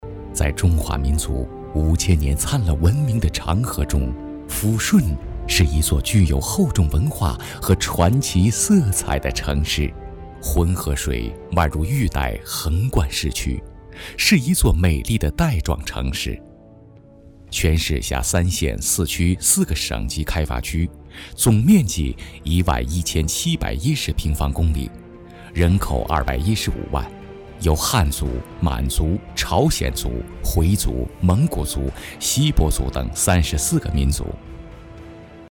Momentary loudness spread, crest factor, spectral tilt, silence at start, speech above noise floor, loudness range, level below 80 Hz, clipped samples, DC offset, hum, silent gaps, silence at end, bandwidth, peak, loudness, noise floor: 11 LU; 18 dB; -4.5 dB/octave; 0 s; 26 dB; 3 LU; -26 dBFS; under 0.1%; under 0.1%; none; none; 0 s; 19.5 kHz; -2 dBFS; -20 LUFS; -45 dBFS